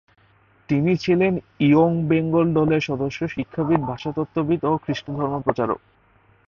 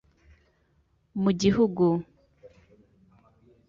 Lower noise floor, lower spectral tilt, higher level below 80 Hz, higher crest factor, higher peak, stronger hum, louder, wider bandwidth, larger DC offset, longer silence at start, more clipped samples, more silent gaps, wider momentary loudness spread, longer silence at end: second, -57 dBFS vs -68 dBFS; about the same, -8 dB/octave vs -7 dB/octave; about the same, -52 dBFS vs -56 dBFS; about the same, 18 dB vs 18 dB; first, -4 dBFS vs -10 dBFS; neither; first, -21 LUFS vs -25 LUFS; about the same, 7 kHz vs 7.6 kHz; neither; second, 0.7 s vs 1.15 s; neither; neither; about the same, 9 LU vs 9 LU; second, 0.7 s vs 1.2 s